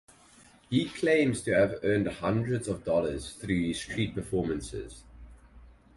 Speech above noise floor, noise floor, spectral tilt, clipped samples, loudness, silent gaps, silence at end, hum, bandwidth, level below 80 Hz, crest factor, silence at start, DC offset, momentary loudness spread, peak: 29 dB; -57 dBFS; -6 dB/octave; under 0.1%; -29 LUFS; none; 0.25 s; none; 11.5 kHz; -50 dBFS; 18 dB; 0.7 s; under 0.1%; 11 LU; -12 dBFS